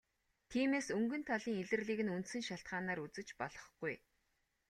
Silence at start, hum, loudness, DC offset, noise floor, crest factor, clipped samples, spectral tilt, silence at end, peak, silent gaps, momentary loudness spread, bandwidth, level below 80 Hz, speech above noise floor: 0.5 s; none; -40 LUFS; under 0.1%; -82 dBFS; 18 dB; under 0.1%; -5 dB/octave; 0.7 s; -24 dBFS; none; 10 LU; 13 kHz; -74 dBFS; 42 dB